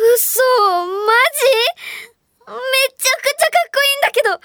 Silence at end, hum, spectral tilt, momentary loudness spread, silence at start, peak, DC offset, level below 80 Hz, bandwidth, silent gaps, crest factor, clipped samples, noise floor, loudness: 0.1 s; none; 1.5 dB/octave; 14 LU; 0 s; 0 dBFS; under 0.1%; -70 dBFS; over 20 kHz; none; 14 dB; under 0.1%; -41 dBFS; -14 LUFS